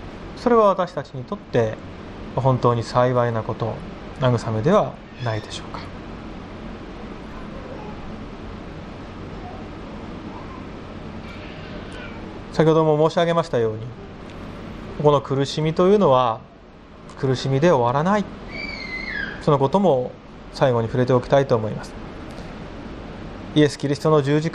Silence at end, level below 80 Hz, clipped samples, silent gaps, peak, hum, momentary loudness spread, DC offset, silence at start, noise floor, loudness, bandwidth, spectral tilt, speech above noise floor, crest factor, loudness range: 0 s; -44 dBFS; under 0.1%; none; -2 dBFS; none; 18 LU; under 0.1%; 0 s; -43 dBFS; -20 LUFS; 11 kHz; -7 dB/octave; 24 dB; 20 dB; 15 LU